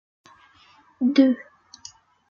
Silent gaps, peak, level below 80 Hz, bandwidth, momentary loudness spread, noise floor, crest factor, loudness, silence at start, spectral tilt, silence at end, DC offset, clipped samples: none; -6 dBFS; -74 dBFS; 7.2 kHz; 25 LU; -56 dBFS; 20 dB; -21 LUFS; 1 s; -4.5 dB/octave; 0.85 s; under 0.1%; under 0.1%